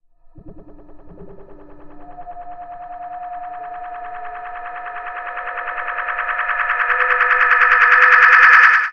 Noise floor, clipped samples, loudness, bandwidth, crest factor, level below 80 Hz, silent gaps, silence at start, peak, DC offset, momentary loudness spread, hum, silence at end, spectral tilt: -41 dBFS; under 0.1%; -12 LUFS; 7.6 kHz; 18 dB; -46 dBFS; none; 0.35 s; 0 dBFS; under 0.1%; 25 LU; none; 0 s; -2 dB/octave